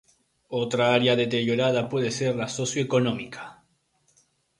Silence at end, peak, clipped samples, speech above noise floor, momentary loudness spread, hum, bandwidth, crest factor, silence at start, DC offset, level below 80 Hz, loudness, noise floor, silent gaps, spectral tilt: 1.05 s; -6 dBFS; under 0.1%; 44 dB; 13 LU; none; 11.5 kHz; 20 dB; 0.5 s; under 0.1%; -64 dBFS; -24 LUFS; -68 dBFS; none; -5 dB/octave